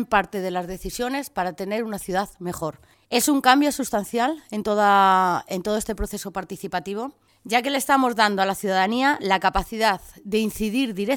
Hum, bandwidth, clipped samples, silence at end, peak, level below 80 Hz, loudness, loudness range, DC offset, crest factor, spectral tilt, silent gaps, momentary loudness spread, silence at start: none; 19 kHz; under 0.1%; 0 s; 0 dBFS; -44 dBFS; -23 LUFS; 3 LU; under 0.1%; 22 dB; -3.5 dB/octave; none; 12 LU; 0 s